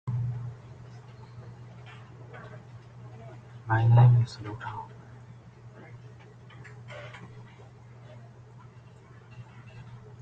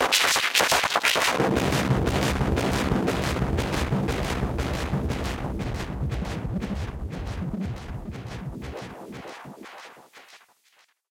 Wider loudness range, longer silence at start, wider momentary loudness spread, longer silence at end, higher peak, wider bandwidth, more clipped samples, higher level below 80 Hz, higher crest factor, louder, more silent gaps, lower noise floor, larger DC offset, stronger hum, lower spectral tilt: first, 20 LU vs 14 LU; about the same, 0.05 s vs 0 s; first, 25 LU vs 19 LU; second, 0.25 s vs 0.75 s; second, -8 dBFS vs -4 dBFS; second, 5.8 kHz vs 17 kHz; neither; second, -60 dBFS vs -36 dBFS; about the same, 22 dB vs 22 dB; about the same, -25 LUFS vs -25 LUFS; neither; second, -51 dBFS vs -63 dBFS; neither; neither; first, -8.5 dB/octave vs -4 dB/octave